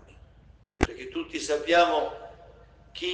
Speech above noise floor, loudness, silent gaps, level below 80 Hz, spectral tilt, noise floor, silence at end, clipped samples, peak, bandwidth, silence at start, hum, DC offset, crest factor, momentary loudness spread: 30 dB; -27 LUFS; none; -46 dBFS; -4 dB/octave; -56 dBFS; 0 s; under 0.1%; -6 dBFS; 9.8 kHz; 0.8 s; none; under 0.1%; 24 dB; 22 LU